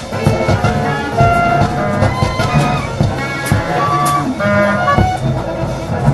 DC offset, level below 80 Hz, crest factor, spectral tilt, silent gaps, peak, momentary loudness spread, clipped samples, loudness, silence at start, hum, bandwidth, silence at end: under 0.1%; -28 dBFS; 14 dB; -6.5 dB/octave; none; 0 dBFS; 5 LU; under 0.1%; -14 LUFS; 0 s; none; 12.5 kHz; 0 s